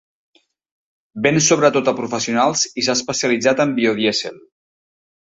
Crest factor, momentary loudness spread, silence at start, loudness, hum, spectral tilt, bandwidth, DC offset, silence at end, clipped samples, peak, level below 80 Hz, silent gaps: 18 dB; 8 LU; 1.15 s; -17 LUFS; none; -3 dB/octave; 8 kHz; under 0.1%; 0.85 s; under 0.1%; -2 dBFS; -60 dBFS; none